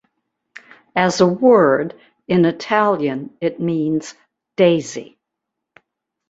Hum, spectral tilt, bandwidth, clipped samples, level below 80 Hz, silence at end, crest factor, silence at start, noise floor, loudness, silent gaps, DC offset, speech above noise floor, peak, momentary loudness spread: none; -6 dB/octave; 8 kHz; under 0.1%; -60 dBFS; 1.25 s; 18 dB; 0.95 s; -80 dBFS; -17 LUFS; none; under 0.1%; 64 dB; -2 dBFS; 16 LU